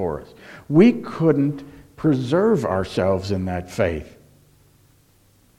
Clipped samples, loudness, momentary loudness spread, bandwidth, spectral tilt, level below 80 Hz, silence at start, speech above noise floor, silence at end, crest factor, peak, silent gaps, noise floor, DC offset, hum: under 0.1%; -20 LUFS; 14 LU; 13 kHz; -8 dB/octave; -48 dBFS; 0 s; 37 dB; 1.5 s; 18 dB; -4 dBFS; none; -57 dBFS; under 0.1%; none